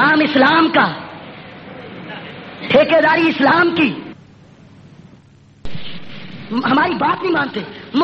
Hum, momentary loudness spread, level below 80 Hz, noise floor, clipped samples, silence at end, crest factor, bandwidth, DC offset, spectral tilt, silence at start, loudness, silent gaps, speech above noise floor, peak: none; 22 LU; -50 dBFS; -46 dBFS; under 0.1%; 0 s; 18 dB; 6.2 kHz; under 0.1%; -7 dB/octave; 0 s; -14 LUFS; none; 32 dB; 0 dBFS